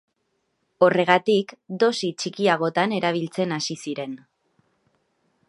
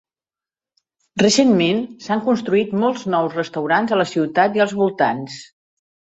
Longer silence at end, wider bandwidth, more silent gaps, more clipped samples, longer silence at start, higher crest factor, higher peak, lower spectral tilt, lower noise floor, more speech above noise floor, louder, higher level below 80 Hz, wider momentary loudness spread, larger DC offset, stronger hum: first, 1.35 s vs 0.7 s; first, 11.5 kHz vs 8.2 kHz; neither; neither; second, 0.8 s vs 1.15 s; first, 24 dB vs 18 dB; about the same, 0 dBFS vs -2 dBFS; about the same, -4.5 dB/octave vs -4.5 dB/octave; second, -73 dBFS vs under -90 dBFS; second, 51 dB vs over 72 dB; second, -22 LUFS vs -18 LUFS; second, -76 dBFS vs -62 dBFS; first, 13 LU vs 9 LU; neither; neither